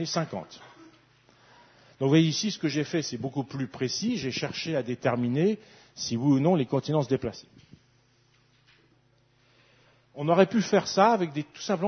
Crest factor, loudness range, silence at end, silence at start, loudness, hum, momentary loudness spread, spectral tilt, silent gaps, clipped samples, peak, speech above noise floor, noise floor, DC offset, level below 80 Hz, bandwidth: 22 dB; 5 LU; 0 s; 0 s; -27 LUFS; none; 13 LU; -5.5 dB/octave; none; under 0.1%; -6 dBFS; 38 dB; -65 dBFS; under 0.1%; -66 dBFS; 6.6 kHz